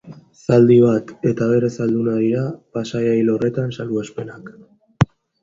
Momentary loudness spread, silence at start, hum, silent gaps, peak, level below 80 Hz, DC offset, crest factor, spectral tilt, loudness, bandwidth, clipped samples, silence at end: 16 LU; 0.05 s; none; none; 0 dBFS; -50 dBFS; under 0.1%; 18 dB; -8 dB/octave; -18 LUFS; 7.6 kHz; under 0.1%; 0.4 s